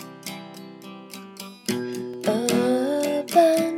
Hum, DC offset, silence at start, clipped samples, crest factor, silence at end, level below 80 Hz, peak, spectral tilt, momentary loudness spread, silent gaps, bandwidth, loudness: none; under 0.1%; 0 s; under 0.1%; 24 dB; 0 s; -78 dBFS; -2 dBFS; -4.5 dB/octave; 22 LU; none; 17 kHz; -23 LUFS